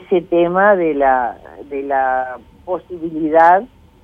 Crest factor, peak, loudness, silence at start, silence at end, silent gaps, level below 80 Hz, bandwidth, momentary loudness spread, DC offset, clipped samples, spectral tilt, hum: 16 dB; 0 dBFS; -15 LUFS; 0 s; 0.35 s; none; -50 dBFS; 5.4 kHz; 15 LU; under 0.1%; under 0.1%; -8 dB/octave; none